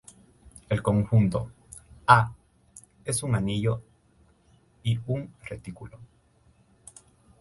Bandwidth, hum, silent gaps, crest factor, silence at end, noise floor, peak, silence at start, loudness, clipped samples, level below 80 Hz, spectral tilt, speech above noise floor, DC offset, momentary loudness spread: 11.5 kHz; none; none; 28 dB; 1.35 s; -62 dBFS; 0 dBFS; 0.45 s; -26 LUFS; under 0.1%; -50 dBFS; -6 dB/octave; 37 dB; under 0.1%; 22 LU